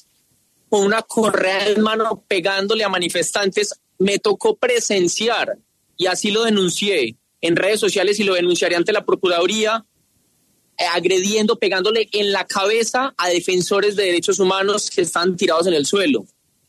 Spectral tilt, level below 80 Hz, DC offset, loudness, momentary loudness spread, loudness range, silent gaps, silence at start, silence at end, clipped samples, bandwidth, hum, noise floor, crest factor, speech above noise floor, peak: -3 dB/octave; -66 dBFS; under 0.1%; -18 LUFS; 4 LU; 1 LU; none; 0.7 s; 0.45 s; under 0.1%; 13.5 kHz; none; -62 dBFS; 14 dB; 44 dB; -4 dBFS